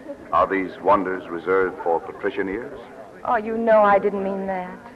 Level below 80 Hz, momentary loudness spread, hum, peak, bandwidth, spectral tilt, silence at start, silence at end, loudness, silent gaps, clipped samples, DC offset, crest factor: -54 dBFS; 14 LU; none; -6 dBFS; 8 kHz; -7.5 dB/octave; 0 s; 0 s; -22 LUFS; none; under 0.1%; under 0.1%; 16 dB